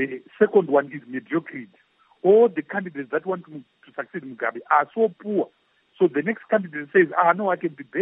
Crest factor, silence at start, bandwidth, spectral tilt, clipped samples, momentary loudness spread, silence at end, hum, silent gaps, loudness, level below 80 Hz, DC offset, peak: 18 dB; 0 s; 3.9 kHz; -10.5 dB/octave; under 0.1%; 16 LU; 0 s; none; none; -22 LUFS; -80 dBFS; under 0.1%; -4 dBFS